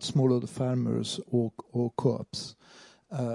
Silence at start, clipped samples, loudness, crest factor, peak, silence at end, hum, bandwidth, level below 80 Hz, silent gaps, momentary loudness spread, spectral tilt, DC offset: 0 s; under 0.1%; -30 LUFS; 18 dB; -12 dBFS; 0 s; none; 11.5 kHz; -68 dBFS; none; 12 LU; -6.5 dB/octave; under 0.1%